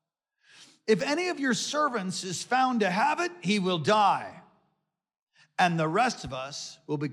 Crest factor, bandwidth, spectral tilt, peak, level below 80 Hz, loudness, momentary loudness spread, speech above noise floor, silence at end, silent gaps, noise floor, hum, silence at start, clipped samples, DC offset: 18 dB; 13.5 kHz; -4 dB/octave; -10 dBFS; -66 dBFS; -27 LUFS; 11 LU; 52 dB; 0 s; 5.22-5.27 s; -79 dBFS; none; 0.6 s; under 0.1%; under 0.1%